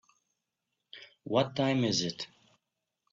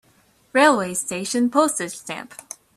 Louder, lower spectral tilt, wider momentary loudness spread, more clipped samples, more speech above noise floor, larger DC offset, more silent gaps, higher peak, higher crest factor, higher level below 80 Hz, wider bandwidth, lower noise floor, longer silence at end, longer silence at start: second, -30 LUFS vs -20 LUFS; first, -4.5 dB/octave vs -3 dB/octave; first, 22 LU vs 17 LU; neither; first, 56 dB vs 38 dB; neither; neither; second, -14 dBFS vs -2 dBFS; about the same, 20 dB vs 20 dB; second, -72 dBFS vs -66 dBFS; second, 8 kHz vs 14 kHz; first, -86 dBFS vs -59 dBFS; first, 0.85 s vs 0.45 s; first, 0.95 s vs 0.55 s